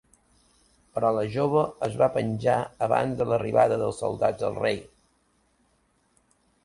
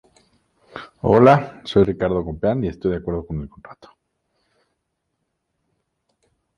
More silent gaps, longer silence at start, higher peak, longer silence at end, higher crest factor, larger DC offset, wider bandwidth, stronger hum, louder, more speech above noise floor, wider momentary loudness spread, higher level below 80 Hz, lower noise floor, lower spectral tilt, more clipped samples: neither; first, 0.95 s vs 0.75 s; second, -8 dBFS vs -2 dBFS; second, 1.8 s vs 2.85 s; about the same, 18 dB vs 20 dB; neither; first, 11.5 kHz vs 9.6 kHz; neither; second, -25 LUFS vs -19 LUFS; second, 43 dB vs 57 dB; second, 6 LU vs 25 LU; second, -58 dBFS vs -44 dBFS; second, -68 dBFS vs -75 dBFS; second, -6.5 dB/octave vs -8.5 dB/octave; neither